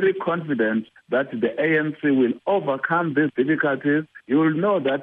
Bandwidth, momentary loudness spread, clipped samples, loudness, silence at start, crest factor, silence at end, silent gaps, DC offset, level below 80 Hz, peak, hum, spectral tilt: 3.9 kHz; 5 LU; under 0.1%; -22 LUFS; 0 s; 14 dB; 0 s; none; under 0.1%; -70 dBFS; -8 dBFS; none; -9.5 dB/octave